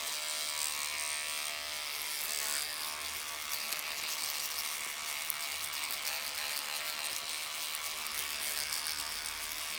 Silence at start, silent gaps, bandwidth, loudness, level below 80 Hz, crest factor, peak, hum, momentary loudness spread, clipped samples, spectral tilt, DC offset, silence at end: 0 s; none; 19 kHz; -35 LUFS; -68 dBFS; 30 dB; -8 dBFS; none; 3 LU; under 0.1%; 2 dB/octave; under 0.1%; 0 s